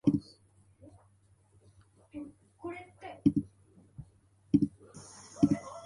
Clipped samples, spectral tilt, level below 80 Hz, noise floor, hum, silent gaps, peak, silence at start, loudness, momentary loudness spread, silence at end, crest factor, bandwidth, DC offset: under 0.1%; -7.5 dB/octave; -62 dBFS; -66 dBFS; none; none; -12 dBFS; 0.05 s; -32 LUFS; 23 LU; 0 s; 24 dB; 11 kHz; under 0.1%